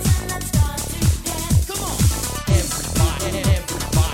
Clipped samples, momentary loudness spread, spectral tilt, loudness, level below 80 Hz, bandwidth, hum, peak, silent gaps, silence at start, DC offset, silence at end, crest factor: under 0.1%; 3 LU; -4.5 dB/octave; -20 LUFS; -26 dBFS; 16.5 kHz; none; -4 dBFS; none; 0 s; under 0.1%; 0 s; 14 dB